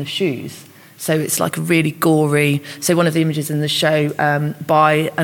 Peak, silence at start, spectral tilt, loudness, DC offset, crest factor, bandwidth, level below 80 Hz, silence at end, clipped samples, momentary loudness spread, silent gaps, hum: 0 dBFS; 0 s; -5 dB/octave; -17 LUFS; under 0.1%; 16 dB; 17.5 kHz; -64 dBFS; 0 s; under 0.1%; 6 LU; none; none